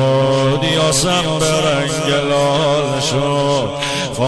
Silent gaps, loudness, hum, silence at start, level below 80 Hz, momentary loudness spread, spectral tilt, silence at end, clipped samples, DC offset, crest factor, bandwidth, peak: none; -15 LUFS; none; 0 s; -40 dBFS; 4 LU; -4 dB/octave; 0 s; under 0.1%; under 0.1%; 10 dB; 11 kHz; -6 dBFS